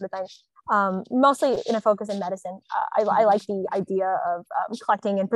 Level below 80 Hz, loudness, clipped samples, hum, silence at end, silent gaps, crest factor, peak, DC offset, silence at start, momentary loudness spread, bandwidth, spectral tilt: -72 dBFS; -24 LUFS; under 0.1%; none; 0 s; none; 18 dB; -6 dBFS; under 0.1%; 0 s; 12 LU; 12.5 kHz; -6 dB/octave